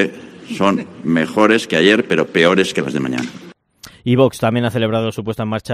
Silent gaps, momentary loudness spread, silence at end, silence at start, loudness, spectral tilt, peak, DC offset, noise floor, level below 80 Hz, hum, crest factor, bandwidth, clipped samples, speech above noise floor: none; 10 LU; 0 s; 0 s; -16 LUFS; -5.5 dB/octave; 0 dBFS; under 0.1%; -43 dBFS; -54 dBFS; none; 16 dB; 15.5 kHz; under 0.1%; 27 dB